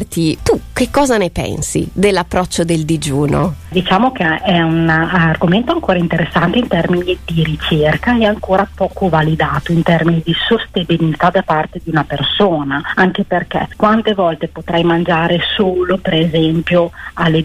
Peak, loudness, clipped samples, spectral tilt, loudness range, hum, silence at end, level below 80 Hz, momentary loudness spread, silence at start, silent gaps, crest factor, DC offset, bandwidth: -2 dBFS; -14 LUFS; under 0.1%; -5.5 dB/octave; 1 LU; none; 0 s; -34 dBFS; 5 LU; 0 s; none; 12 dB; under 0.1%; 14.5 kHz